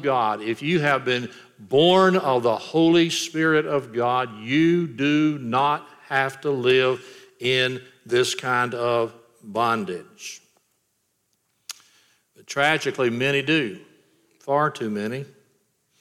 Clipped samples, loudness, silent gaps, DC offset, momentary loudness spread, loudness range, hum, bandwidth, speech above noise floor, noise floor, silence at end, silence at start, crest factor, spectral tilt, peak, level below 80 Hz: under 0.1%; -22 LUFS; none; under 0.1%; 17 LU; 8 LU; none; 15 kHz; 50 dB; -72 dBFS; 0.75 s; 0 s; 18 dB; -5 dB/octave; -6 dBFS; -72 dBFS